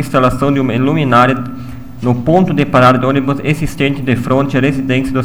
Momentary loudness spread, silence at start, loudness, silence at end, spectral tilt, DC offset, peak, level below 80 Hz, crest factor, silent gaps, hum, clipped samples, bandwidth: 8 LU; 0 s; -13 LUFS; 0 s; -7 dB/octave; 3%; 0 dBFS; -34 dBFS; 12 dB; none; none; under 0.1%; 17.5 kHz